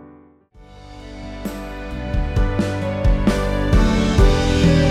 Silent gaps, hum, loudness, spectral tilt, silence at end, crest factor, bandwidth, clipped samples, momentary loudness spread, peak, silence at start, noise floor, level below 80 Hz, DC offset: none; none; -19 LUFS; -6.5 dB/octave; 0 s; 16 dB; 13.5 kHz; under 0.1%; 16 LU; -2 dBFS; 0 s; -47 dBFS; -22 dBFS; under 0.1%